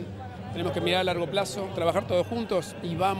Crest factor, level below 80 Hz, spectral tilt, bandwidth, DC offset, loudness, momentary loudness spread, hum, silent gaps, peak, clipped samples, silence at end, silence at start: 18 dB; -56 dBFS; -5 dB/octave; 15.5 kHz; under 0.1%; -28 LUFS; 9 LU; none; none; -10 dBFS; under 0.1%; 0 s; 0 s